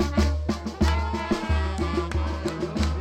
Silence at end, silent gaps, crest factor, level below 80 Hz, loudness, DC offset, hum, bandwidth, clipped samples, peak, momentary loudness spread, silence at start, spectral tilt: 0 s; none; 12 dB; -28 dBFS; -26 LUFS; under 0.1%; none; 9.4 kHz; under 0.1%; -12 dBFS; 5 LU; 0 s; -6.5 dB/octave